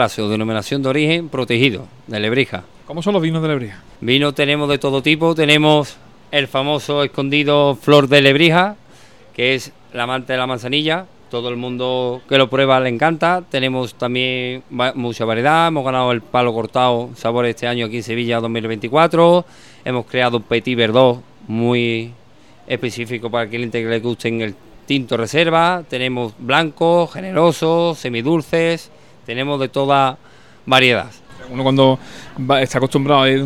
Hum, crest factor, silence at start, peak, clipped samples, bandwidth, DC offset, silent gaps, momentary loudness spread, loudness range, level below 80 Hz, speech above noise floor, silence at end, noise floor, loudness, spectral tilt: none; 16 dB; 0 s; 0 dBFS; under 0.1%; 15.5 kHz; 0.4%; none; 11 LU; 4 LU; -56 dBFS; 31 dB; 0 s; -48 dBFS; -16 LUFS; -5.5 dB/octave